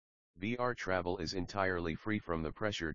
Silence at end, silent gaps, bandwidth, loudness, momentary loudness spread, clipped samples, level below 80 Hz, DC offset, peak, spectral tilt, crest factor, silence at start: 0 s; none; 7.4 kHz; -37 LUFS; 4 LU; under 0.1%; -56 dBFS; 0.2%; -16 dBFS; -4 dB/octave; 20 dB; 0.35 s